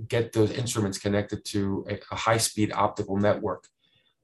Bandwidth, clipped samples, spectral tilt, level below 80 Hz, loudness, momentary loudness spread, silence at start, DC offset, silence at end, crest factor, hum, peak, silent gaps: 13.5 kHz; under 0.1%; -5 dB/octave; -52 dBFS; -27 LUFS; 8 LU; 0 s; under 0.1%; 0.65 s; 22 dB; none; -6 dBFS; none